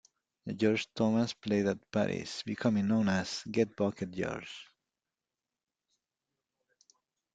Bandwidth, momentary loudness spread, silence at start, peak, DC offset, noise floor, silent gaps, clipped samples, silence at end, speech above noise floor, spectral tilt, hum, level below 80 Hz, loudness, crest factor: 9 kHz; 11 LU; 0.45 s; -14 dBFS; under 0.1%; under -90 dBFS; none; under 0.1%; 2.7 s; over 58 dB; -6 dB/octave; none; -68 dBFS; -32 LUFS; 20 dB